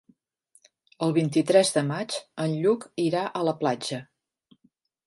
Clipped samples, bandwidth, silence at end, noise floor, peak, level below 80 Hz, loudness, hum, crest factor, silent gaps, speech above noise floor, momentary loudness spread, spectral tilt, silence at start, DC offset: under 0.1%; 11.5 kHz; 1.05 s; -68 dBFS; -6 dBFS; -74 dBFS; -25 LUFS; none; 20 dB; none; 43 dB; 11 LU; -5 dB/octave; 1 s; under 0.1%